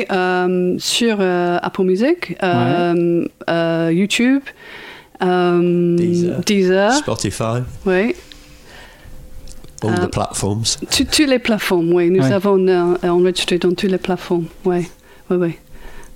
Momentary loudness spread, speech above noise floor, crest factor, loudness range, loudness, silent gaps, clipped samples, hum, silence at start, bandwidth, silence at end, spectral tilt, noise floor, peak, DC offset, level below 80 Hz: 7 LU; 24 dB; 16 dB; 6 LU; -16 LUFS; none; under 0.1%; none; 0 s; 16.5 kHz; 0 s; -5 dB/octave; -40 dBFS; 0 dBFS; under 0.1%; -42 dBFS